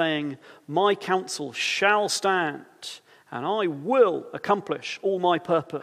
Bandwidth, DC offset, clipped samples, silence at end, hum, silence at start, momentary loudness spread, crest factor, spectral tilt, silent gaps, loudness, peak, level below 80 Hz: 15 kHz; under 0.1%; under 0.1%; 0 s; none; 0 s; 17 LU; 20 dB; -3.5 dB/octave; none; -25 LUFS; -6 dBFS; -78 dBFS